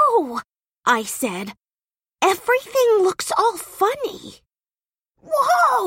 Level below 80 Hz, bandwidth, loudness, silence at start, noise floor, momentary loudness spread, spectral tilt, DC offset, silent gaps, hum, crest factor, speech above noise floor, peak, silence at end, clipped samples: -64 dBFS; 16.5 kHz; -20 LUFS; 0 s; under -90 dBFS; 13 LU; -2.5 dB/octave; under 0.1%; none; none; 18 dB; over 71 dB; -4 dBFS; 0 s; under 0.1%